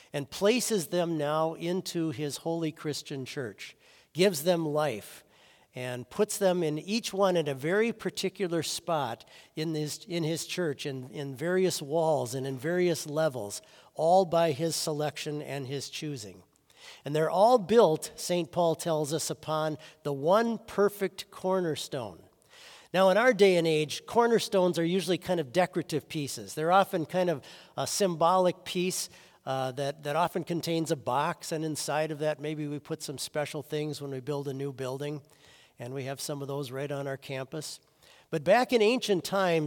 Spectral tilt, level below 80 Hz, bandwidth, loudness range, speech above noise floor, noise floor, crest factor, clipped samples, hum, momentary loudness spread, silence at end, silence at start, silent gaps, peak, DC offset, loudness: -4.5 dB/octave; -74 dBFS; 18 kHz; 7 LU; 32 dB; -61 dBFS; 20 dB; under 0.1%; none; 13 LU; 0 s; 0.15 s; none; -10 dBFS; under 0.1%; -29 LUFS